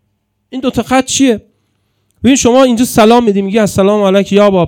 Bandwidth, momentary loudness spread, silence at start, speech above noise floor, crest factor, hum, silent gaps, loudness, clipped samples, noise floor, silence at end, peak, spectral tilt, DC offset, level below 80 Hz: 17.5 kHz; 9 LU; 0.5 s; 55 dB; 10 dB; none; none; -10 LUFS; 1%; -63 dBFS; 0 s; 0 dBFS; -4.5 dB/octave; under 0.1%; -42 dBFS